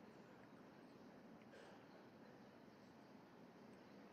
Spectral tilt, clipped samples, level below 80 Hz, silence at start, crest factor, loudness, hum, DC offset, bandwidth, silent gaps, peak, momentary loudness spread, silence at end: -6 dB/octave; under 0.1%; under -90 dBFS; 0 s; 14 dB; -64 LUFS; none; under 0.1%; 13 kHz; none; -50 dBFS; 2 LU; 0 s